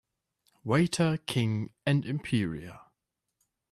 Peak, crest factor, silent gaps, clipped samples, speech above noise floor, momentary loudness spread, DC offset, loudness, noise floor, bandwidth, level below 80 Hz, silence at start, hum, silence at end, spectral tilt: -14 dBFS; 18 dB; none; under 0.1%; 54 dB; 13 LU; under 0.1%; -29 LUFS; -83 dBFS; 14 kHz; -62 dBFS; 0.65 s; none; 0.95 s; -6 dB/octave